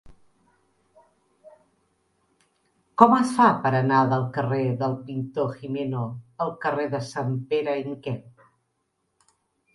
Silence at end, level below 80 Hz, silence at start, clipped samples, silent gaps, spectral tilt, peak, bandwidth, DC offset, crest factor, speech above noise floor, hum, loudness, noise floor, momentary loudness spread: 1.45 s; -64 dBFS; 0.05 s; under 0.1%; none; -7.5 dB/octave; 0 dBFS; 11.5 kHz; under 0.1%; 26 dB; 52 dB; none; -24 LUFS; -75 dBFS; 14 LU